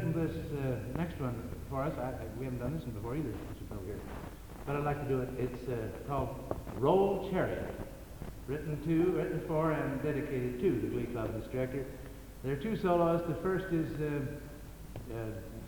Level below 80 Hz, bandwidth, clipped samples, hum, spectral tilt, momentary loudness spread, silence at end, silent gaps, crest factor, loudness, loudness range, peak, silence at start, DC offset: -50 dBFS; 19.5 kHz; under 0.1%; none; -8 dB/octave; 15 LU; 0 s; none; 20 dB; -35 LUFS; 5 LU; -14 dBFS; 0 s; under 0.1%